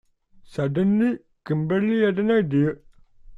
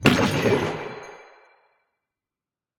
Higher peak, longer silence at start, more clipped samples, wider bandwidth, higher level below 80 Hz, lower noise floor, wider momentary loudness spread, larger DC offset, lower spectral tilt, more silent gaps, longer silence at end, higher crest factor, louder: second, -10 dBFS vs 0 dBFS; first, 0.5 s vs 0 s; neither; second, 7.4 kHz vs 17.5 kHz; about the same, -56 dBFS vs -54 dBFS; second, -51 dBFS vs under -90 dBFS; second, 11 LU vs 20 LU; neither; first, -9 dB/octave vs -5.5 dB/octave; neither; second, 0 s vs 1.55 s; second, 14 dB vs 24 dB; about the same, -22 LUFS vs -22 LUFS